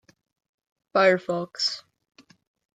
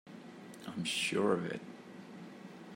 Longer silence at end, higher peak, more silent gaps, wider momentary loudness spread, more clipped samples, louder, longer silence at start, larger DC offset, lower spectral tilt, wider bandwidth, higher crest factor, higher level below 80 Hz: first, 0.95 s vs 0 s; first, -6 dBFS vs -18 dBFS; neither; second, 10 LU vs 19 LU; neither; first, -24 LUFS vs -35 LUFS; first, 0.95 s vs 0.05 s; neither; about the same, -4 dB/octave vs -4 dB/octave; second, 9.2 kHz vs 16 kHz; about the same, 22 dB vs 22 dB; first, -78 dBFS vs -84 dBFS